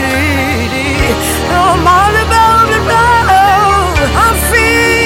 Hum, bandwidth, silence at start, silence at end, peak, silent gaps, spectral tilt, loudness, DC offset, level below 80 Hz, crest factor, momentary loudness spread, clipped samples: none; 17 kHz; 0 s; 0 s; 0 dBFS; none; -4 dB/octave; -9 LUFS; under 0.1%; -22 dBFS; 10 dB; 5 LU; under 0.1%